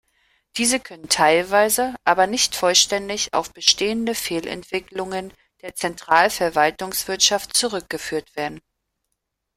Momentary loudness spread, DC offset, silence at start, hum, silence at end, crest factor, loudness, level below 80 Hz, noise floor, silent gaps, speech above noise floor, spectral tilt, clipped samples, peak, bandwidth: 13 LU; under 0.1%; 0.55 s; none; 0.95 s; 22 dB; -20 LUFS; -56 dBFS; -78 dBFS; none; 57 dB; -1.5 dB/octave; under 0.1%; 0 dBFS; 16 kHz